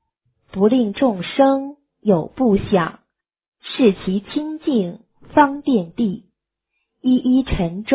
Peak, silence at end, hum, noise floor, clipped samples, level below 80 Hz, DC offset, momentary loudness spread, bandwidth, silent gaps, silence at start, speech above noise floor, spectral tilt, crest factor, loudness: -2 dBFS; 0 s; none; -76 dBFS; under 0.1%; -42 dBFS; under 0.1%; 10 LU; 4 kHz; 3.48-3.52 s; 0.55 s; 59 dB; -11 dB/octave; 18 dB; -19 LUFS